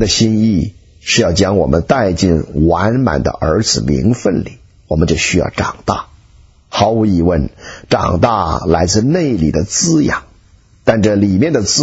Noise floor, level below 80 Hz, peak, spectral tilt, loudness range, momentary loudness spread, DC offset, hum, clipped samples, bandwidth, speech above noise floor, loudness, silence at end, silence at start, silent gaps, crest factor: -46 dBFS; -30 dBFS; 0 dBFS; -5 dB/octave; 3 LU; 8 LU; under 0.1%; none; under 0.1%; 8 kHz; 34 dB; -14 LUFS; 0 s; 0 s; none; 14 dB